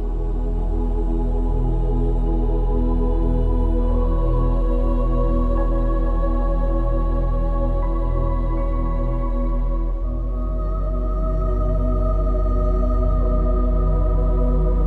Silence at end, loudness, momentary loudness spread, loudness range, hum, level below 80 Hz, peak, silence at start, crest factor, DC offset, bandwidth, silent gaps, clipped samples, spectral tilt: 0 s; -23 LUFS; 4 LU; 3 LU; none; -20 dBFS; -8 dBFS; 0 s; 10 dB; under 0.1%; 2.9 kHz; none; under 0.1%; -10.5 dB/octave